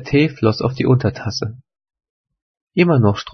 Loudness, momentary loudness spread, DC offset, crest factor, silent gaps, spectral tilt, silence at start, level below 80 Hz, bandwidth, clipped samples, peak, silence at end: -17 LUFS; 11 LU; under 0.1%; 18 dB; 2.10-2.24 s, 2.42-2.54 s, 2.61-2.67 s; -7 dB/octave; 0 s; -48 dBFS; 6.4 kHz; under 0.1%; 0 dBFS; 0.05 s